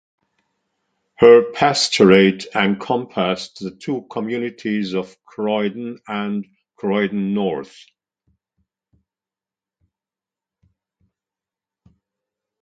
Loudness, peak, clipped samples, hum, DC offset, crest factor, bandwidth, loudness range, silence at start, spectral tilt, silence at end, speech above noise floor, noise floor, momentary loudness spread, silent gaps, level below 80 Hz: -18 LUFS; 0 dBFS; under 0.1%; none; under 0.1%; 20 dB; 9.4 kHz; 11 LU; 1.2 s; -5 dB/octave; 4.95 s; over 72 dB; under -90 dBFS; 17 LU; none; -60 dBFS